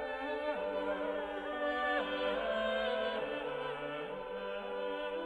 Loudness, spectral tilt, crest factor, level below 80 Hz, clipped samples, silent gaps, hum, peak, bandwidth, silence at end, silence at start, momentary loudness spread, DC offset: -37 LUFS; -5 dB/octave; 14 dB; -64 dBFS; under 0.1%; none; none; -22 dBFS; 10 kHz; 0 s; 0 s; 7 LU; under 0.1%